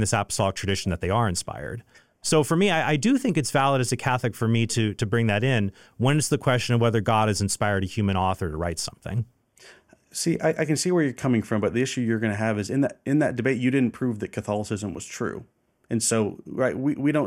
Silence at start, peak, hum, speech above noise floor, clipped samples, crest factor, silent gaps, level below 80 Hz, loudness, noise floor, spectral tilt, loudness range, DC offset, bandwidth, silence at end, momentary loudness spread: 0 s; -8 dBFS; none; 29 dB; under 0.1%; 16 dB; none; -54 dBFS; -24 LUFS; -53 dBFS; -5 dB/octave; 4 LU; under 0.1%; 16.5 kHz; 0 s; 9 LU